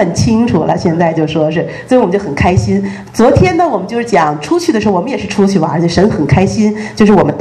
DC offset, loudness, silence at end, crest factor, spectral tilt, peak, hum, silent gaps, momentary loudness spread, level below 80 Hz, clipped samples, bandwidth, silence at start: under 0.1%; -11 LUFS; 0 s; 10 dB; -6.5 dB/octave; 0 dBFS; none; none; 6 LU; -32 dBFS; 0.5%; 12.5 kHz; 0 s